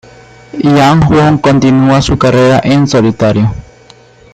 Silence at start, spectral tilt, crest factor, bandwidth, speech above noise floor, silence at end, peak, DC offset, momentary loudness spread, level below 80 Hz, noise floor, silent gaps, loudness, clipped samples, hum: 0.55 s; -6.5 dB/octave; 8 dB; 9.2 kHz; 32 dB; 0.7 s; 0 dBFS; under 0.1%; 7 LU; -30 dBFS; -39 dBFS; none; -8 LUFS; under 0.1%; none